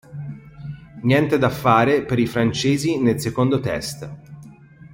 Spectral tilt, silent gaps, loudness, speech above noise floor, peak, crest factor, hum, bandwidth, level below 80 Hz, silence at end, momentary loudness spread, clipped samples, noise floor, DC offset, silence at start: -6 dB/octave; none; -19 LUFS; 25 dB; -2 dBFS; 18 dB; none; 16.5 kHz; -50 dBFS; 0 s; 20 LU; under 0.1%; -43 dBFS; under 0.1%; 0.1 s